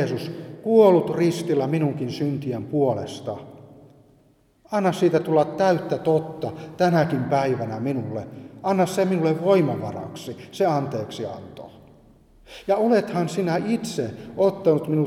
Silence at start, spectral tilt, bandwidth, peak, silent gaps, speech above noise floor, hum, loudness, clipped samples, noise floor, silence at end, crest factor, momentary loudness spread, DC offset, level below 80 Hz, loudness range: 0 s; -7 dB/octave; 15.5 kHz; -4 dBFS; none; 37 dB; none; -22 LUFS; under 0.1%; -59 dBFS; 0 s; 20 dB; 14 LU; under 0.1%; -62 dBFS; 5 LU